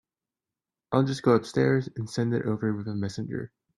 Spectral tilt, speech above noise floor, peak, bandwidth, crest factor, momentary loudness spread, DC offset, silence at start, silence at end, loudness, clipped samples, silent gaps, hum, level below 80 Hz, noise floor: -7 dB/octave; over 64 dB; -8 dBFS; 11.5 kHz; 20 dB; 10 LU; under 0.1%; 0.9 s; 0.3 s; -27 LUFS; under 0.1%; none; none; -64 dBFS; under -90 dBFS